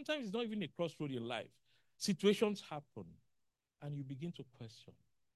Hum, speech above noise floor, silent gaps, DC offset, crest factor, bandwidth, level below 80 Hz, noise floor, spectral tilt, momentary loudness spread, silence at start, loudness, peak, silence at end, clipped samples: none; 44 dB; none; under 0.1%; 22 dB; 12.5 kHz; -80 dBFS; -84 dBFS; -5 dB/octave; 21 LU; 0 s; -40 LUFS; -20 dBFS; 0.45 s; under 0.1%